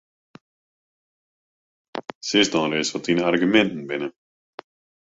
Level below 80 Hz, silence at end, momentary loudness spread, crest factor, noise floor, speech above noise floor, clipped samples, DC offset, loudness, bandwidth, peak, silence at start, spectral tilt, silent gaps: -64 dBFS; 0.95 s; 16 LU; 22 dB; under -90 dBFS; over 69 dB; under 0.1%; under 0.1%; -21 LUFS; 8 kHz; -4 dBFS; 1.95 s; -4 dB/octave; 2.15-2.21 s